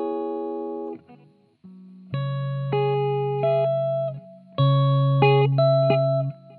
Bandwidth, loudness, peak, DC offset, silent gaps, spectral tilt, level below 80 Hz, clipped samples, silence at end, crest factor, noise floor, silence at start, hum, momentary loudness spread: 4.4 kHz; -22 LUFS; -6 dBFS; under 0.1%; none; -11 dB/octave; -74 dBFS; under 0.1%; 0.05 s; 16 dB; -55 dBFS; 0 s; none; 15 LU